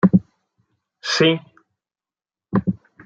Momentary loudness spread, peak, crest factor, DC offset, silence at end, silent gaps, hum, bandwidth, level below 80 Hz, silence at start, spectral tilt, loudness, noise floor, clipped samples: 10 LU; -2 dBFS; 20 dB; under 0.1%; 0.3 s; none; none; 7.6 kHz; -56 dBFS; 0.05 s; -5.5 dB/octave; -20 LUFS; under -90 dBFS; under 0.1%